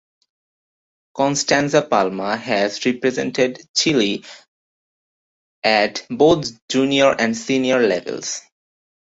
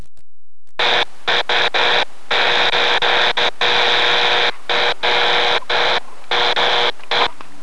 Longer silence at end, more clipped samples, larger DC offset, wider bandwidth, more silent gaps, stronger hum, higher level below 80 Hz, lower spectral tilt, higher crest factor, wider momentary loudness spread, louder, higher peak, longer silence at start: first, 0.8 s vs 0.3 s; neither; second, under 0.1% vs 8%; second, 8.2 kHz vs 11 kHz; first, 3.69-3.74 s, 4.48-5.62 s, 6.62-6.68 s vs none; neither; about the same, -58 dBFS vs -56 dBFS; first, -3.5 dB/octave vs -1.5 dB/octave; about the same, 18 dB vs 16 dB; first, 8 LU vs 5 LU; second, -18 LUFS vs -15 LUFS; about the same, -2 dBFS vs 0 dBFS; first, 1.15 s vs 0.8 s